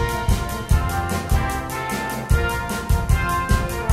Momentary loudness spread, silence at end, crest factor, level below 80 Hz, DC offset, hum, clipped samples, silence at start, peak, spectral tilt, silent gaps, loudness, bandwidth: 5 LU; 0 s; 16 dB; -24 dBFS; under 0.1%; none; under 0.1%; 0 s; -4 dBFS; -5 dB/octave; none; -22 LUFS; 16 kHz